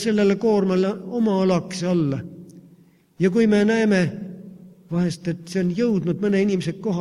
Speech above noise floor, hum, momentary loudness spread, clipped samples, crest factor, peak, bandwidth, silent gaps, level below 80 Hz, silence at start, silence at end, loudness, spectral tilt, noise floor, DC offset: 33 dB; none; 11 LU; under 0.1%; 14 dB; -6 dBFS; 11.5 kHz; none; -58 dBFS; 0 s; 0 s; -21 LUFS; -7 dB/octave; -53 dBFS; under 0.1%